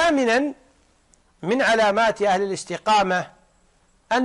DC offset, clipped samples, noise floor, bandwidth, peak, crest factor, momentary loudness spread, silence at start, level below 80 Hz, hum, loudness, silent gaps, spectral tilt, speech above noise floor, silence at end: under 0.1%; under 0.1%; -60 dBFS; 11.5 kHz; -10 dBFS; 12 dB; 10 LU; 0 s; -56 dBFS; none; -21 LUFS; none; -4 dB/octave; 40 dB; 0 s